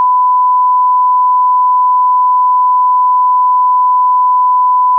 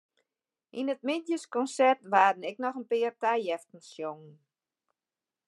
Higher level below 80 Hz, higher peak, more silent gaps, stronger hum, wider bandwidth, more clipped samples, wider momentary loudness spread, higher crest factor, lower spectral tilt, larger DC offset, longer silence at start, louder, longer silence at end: about the same, under -90 dBFS vs under -90 dBFS; about the same, -6 dBFS vs -8 dBFS; neither; neither; second, 1.1 kHz vs 11.5 kHz; neither; second, 0 LU vs 15 LU; second, 4 dB vs 22 dB; about the same, -4 dB/octave vs -4 dB/octave; neither; second, 0 s vs 0.75 s; first, -9 LUFS vs -29 LUFS; second, 0 s vs 1.15 s